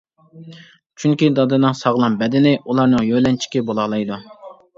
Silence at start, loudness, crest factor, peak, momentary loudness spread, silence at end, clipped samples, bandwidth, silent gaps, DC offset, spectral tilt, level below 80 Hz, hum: 0.35 s; -17 LUFS; 16 dB; -2 dBFS; 7 LU; 0.25 s; under 0.1%; 7.6 kHz; 0.86-0.90 s; under 0.1%; -6.5 dB/octave; -54 dBFS; none